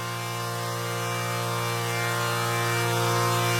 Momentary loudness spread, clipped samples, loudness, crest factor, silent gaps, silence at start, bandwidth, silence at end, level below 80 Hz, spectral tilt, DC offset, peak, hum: 6 LU; under 0.1%; -26 LUFS; 16 dB; none; 0 s; 16 kHz; 0 s; -64 dBFS; -4 dB/octave; under 0.1%; -12 dBFS; none